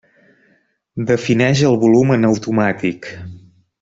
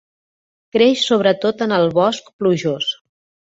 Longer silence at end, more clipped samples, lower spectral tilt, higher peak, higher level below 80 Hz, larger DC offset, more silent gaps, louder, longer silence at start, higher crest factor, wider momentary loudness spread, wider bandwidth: about the same, 0.45 s vs 0.5 s; neither; first, -6.5 dB/octave vs -5 dB/octave; about the same, -2 dBFS vs -2 dBFS; first, -52 dBFS vs -60 dBFS; neither; second, none vs 2.33-2.39 s; about the same, -15 LUFS vs -17 LUFS; first, 0.95 s vs 0.75 s; about the same, 14 dB vs 16 dB; first, 19 LU vs 8 LU; about the same, 7.8 kHz vs 8 kHz